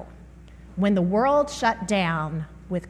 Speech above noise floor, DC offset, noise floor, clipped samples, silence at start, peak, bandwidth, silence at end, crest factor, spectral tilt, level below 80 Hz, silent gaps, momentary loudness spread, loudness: 23 dB; under 0.1%; -45 dBFS; under 0.1%; 0 s; -8 dBFS; 12 kHz; 0 s; 16 dB; -6 dB/octave; -46 dBFS; none; 13 LU; -23 LUFS